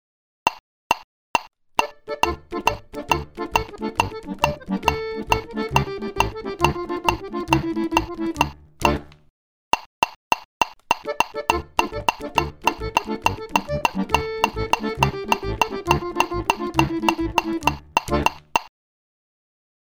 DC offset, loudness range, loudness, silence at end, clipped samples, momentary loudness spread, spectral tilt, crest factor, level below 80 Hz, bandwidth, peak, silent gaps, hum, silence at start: under 0.1%; 3 LU; -23 LUFS; 1.2 s; under 0.1%; 4 LU; -4 dB/octave; 22 dB; -38 dBFS; over 20 kHz; -2 dBFS; 0.60-0.90 s, 1.04-1.34 s, 9.30-9.71 s, 9.86-10.02 s, 10.16-10.31 s, 10.45-10.60 s; none; 0.45 s